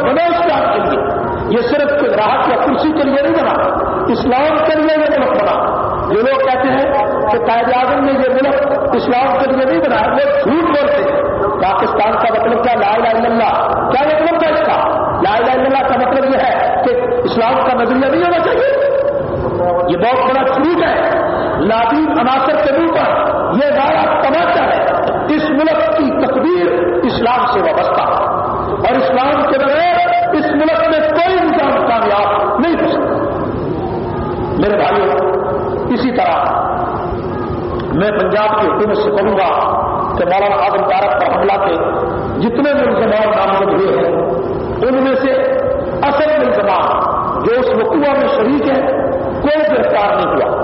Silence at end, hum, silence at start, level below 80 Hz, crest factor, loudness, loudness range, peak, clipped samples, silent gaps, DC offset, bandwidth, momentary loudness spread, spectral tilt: 0 s; none; 0 s; -38 dBFS; 10 dB; -13 LUFS; 2 LU; -4 dBFS; under 0.1%; none; under 0.1%; 5.8 kHz; 4 LU; -4 dB/octave